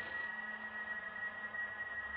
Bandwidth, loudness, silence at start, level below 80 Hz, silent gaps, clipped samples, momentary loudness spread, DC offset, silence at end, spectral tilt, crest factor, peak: 5.2 kHz; -42 LUFS; 0 s; -72 dBFS; none; under 0.1%; 2 LU; under 0.1%; 0 s; -0.5 dB/octave; 12 dB; -32 dBFS